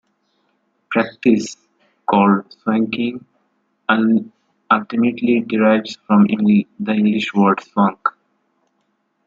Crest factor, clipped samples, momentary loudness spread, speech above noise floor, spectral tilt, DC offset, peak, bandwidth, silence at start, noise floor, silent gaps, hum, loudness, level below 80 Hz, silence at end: 16 dB; under 0.1%; 9 LU; 51 dB; -6.5 dB/octave; under 0.1%; -2 dBFS; 7.6 kHz; 0.9 s; -67 dBFS; none; none; -17 LUFS; -64 dBFS; 1.15 s